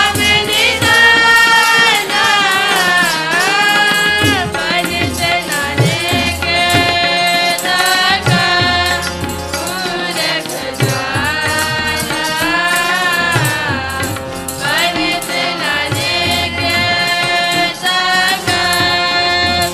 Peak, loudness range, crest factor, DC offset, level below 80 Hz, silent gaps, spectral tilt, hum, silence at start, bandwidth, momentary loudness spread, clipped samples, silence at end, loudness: 0 dBFS; 6 LU; 14 dB; under 0.1%; -38 dBFS; none; -2.5 dB/octave; none; 0 s; 16 kHz; 8 LU; under 0.1%; 0 s; -12 LUFS